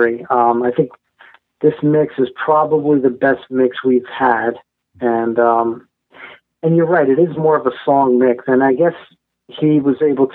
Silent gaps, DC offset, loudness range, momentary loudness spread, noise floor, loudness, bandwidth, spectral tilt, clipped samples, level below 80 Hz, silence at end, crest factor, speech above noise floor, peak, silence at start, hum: none; under 0.1%; 2 LU; 6 LU; -48 dBFS; -15 LUFS; 4.1 kHz; -10.5 dB/octave; under 0.1%; -62 dBFS; 0 s; 16 dB; 33 dB; 0 dBFS; 0 s; none